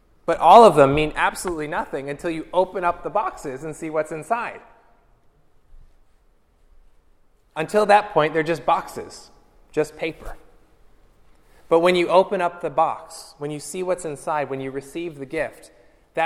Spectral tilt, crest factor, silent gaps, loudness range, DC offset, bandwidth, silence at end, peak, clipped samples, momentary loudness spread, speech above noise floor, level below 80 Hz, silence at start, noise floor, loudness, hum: -5 dB/octave; 22 dB; none; 10 LU; under 0.1%; 15.5 kHz; 0 s; 0 dBFS; under 0.1%; 16 LU; 37 dB; -48 dBFS; 0.3 s; -58 dBFS; -21 LUFS; none